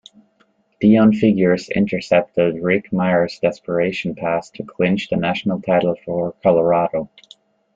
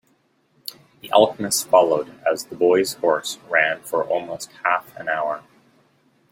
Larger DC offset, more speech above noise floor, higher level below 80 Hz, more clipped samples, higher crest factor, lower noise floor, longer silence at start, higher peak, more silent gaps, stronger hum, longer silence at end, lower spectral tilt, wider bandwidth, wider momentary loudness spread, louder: neither; about the same, 43 dB vs 43 dB; first, -54 dBFS vs -68 dBFS; neither; about the same, 16 dB vs 20 dB; about the same, -61 dBFS vs -64 dBFS; second, 0.8 s vs 1.05 s; about the same, -2 dBFS vs -2 dBFS; neither; neither; second, 0.7 s vs 0.95 s; first, -7.5 dB/octave vs -2.5 dB/octave; second, 7.6 kHz vs 16.5 kHz; second, 8 LU vs 16 LU; about the same, -18 LUFS vs -20 LUFS